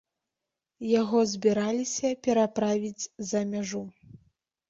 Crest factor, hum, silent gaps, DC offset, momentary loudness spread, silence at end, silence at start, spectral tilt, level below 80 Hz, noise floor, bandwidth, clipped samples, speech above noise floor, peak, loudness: 18 dB; none; none; under 0.1%; 11 LU; 0.55 s; 0.8 s; -4.5 dB/octave; -68 dBFS; -87 dBFS; 8 kHz; under 0.1%; 60 dB; -10 dBFS; -28 LUFS